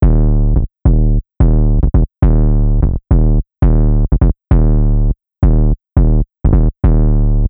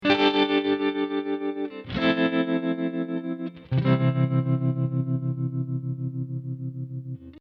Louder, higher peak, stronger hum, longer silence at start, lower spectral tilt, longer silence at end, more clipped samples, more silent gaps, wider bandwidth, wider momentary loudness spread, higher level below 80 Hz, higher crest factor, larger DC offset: first, -14 LUFS vs -26 LUFS; first, 0 dBFS vs -8 dBFS; neither; about the same, 0 s vs 0 s; first, -14 dB/octave vs -8.5 dB/octave; about the same, 0 s vs 0 s; neither; neither; second, 2.3 kHz vs 6 kHz; second, 3 LU vs 12 LU; first, -12 dBFS vs -58 dBFS; second, 10 dB vs 16 dB; neither